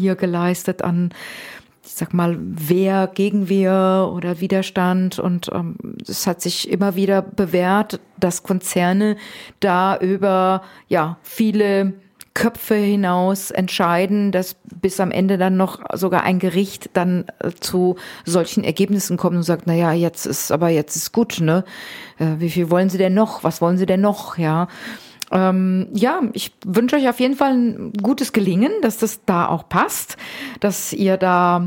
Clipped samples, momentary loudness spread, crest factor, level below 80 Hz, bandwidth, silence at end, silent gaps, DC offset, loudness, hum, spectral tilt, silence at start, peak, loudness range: under 0.1%; 8 LU; 16 dB; -58 dBFS; 17 kHz; 0 s; none; under 0.1%; -19 LUFS; none; -5.5 dB/octave; 0 s; -2 dBFS; 2 LU